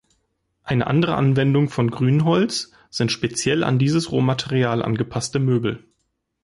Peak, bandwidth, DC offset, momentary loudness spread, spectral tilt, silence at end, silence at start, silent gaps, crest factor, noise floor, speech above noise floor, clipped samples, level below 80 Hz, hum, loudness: -8 dBFS; 11.5 kHz; under 0.1%; 7 LU; -6 dB/octave; 0.65 s; 0.65 s; none; 14 dB; -73 dBFS; 53 dB; under 0.1%; -52 dBFS; none; -20 LUFS